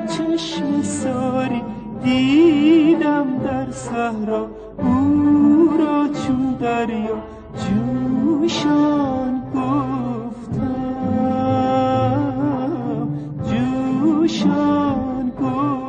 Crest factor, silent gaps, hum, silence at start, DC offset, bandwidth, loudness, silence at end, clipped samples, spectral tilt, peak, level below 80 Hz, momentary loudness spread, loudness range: 14 dB; none; none; 0 s; under 0.1%; 9.4 kHz; -19 LUFS; 0 s; under 0.1%; -6.5 dB/octave; -4 dBFS; -46 dBFS; 11 LU; 3 LU